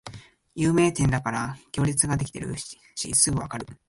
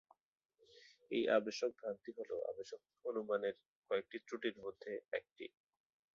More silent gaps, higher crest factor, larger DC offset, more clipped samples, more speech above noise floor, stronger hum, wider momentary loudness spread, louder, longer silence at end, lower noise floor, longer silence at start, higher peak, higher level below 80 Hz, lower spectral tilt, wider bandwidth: second, none vs 3.68-3.82 s, 5.32-5.36 s; about the same, 20 dB vs 22 dB; neither; neither; second, 20 dB vs 25 dB; neither; about the same, 15 LU vs 16 LU; first, -24 LUFS vs -42 LUFS; second, 0.15 s vs 0.65 s; second, -45 dBFS vs -66 dBFS; second, 0.05 s vs 0.75 s; first, -6 dBFS vs -20 dBFS; first, -46 dBFS vs -86 dBFS; first, -4.5 dB/octave vs -2.5 dB/octave; first, 11.5 kHz vs 7.4 kHz